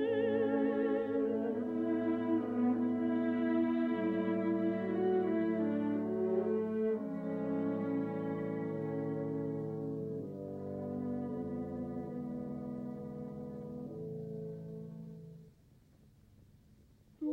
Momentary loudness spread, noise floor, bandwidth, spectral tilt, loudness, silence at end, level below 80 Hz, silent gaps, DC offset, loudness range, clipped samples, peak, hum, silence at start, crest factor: 12 LU; -64 dBFS; 4.5 kHz; -9.5 dB/octave; -36 LUFS; 0 s; -70 dBFS; none; under 0.1%; 12 LU; under 0.1%; -22 dBFS; none; 0 s; 14 dB